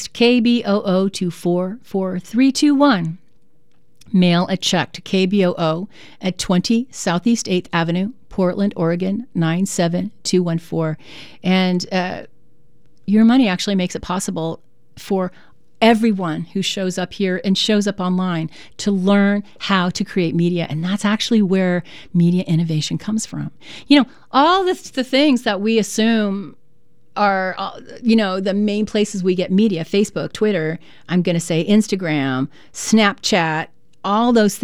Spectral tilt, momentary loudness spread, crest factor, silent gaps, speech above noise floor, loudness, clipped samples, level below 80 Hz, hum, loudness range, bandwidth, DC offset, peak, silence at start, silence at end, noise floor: -5.5 dB/octave; 11 LU; 16 dB; none; 44 dB; -18 LUFS; under 0.1%; -52 dBFS; none; 3 LU; 15 kHz; 0.8%; -2 dBFS; 0 s; 0.05 s; -62 dBFS